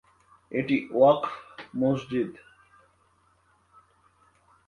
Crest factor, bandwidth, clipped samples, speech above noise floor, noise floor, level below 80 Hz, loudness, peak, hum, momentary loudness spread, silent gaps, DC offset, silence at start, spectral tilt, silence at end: 22 dB; 9.4 kHz; under 0.1%; 41 dB; -65 dBFS; -66 dBFS; -26 LUFS; -8 dBFS; none; 14 LU; none; under 0.1%; 0.5 s; -8 dB/octave; 2.35 s